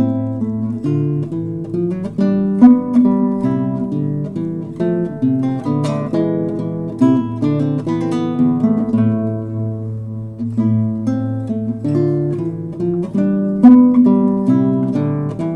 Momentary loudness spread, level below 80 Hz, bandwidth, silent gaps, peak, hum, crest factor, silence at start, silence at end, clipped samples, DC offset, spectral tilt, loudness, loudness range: 12 LU; -48 dBFS; 6.6 kHz; none; 0 dBFS; none; 16 dB; 0 s; 0 s; under 0.1%; under 0.1%; -10 dB/octave; -16 LUFS; 6 LU